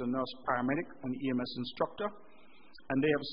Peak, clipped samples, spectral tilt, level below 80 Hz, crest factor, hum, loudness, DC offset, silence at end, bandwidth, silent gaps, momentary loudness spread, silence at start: -16 dBFS; under 0.1%; -4 dB/octave; -66 dBFS; 18 dB; none; -35 LUFS; 0.3%; 0 s; 5.2 kHz; none; 9 LU; 0 s